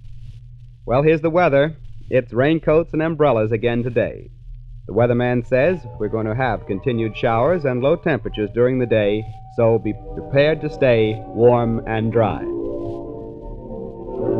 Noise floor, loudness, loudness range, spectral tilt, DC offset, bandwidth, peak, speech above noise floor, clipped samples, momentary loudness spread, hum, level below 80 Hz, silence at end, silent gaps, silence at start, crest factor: -39 dBFS; -19 LUFS; 3 LU; -9.5 dB/octave; 0.2%; 6 kHz; -2 dBFS; 21 dB; under 0.1%; 14 LU; none; -38 dBFS; 0 s; none; 0.05 s; 16 dB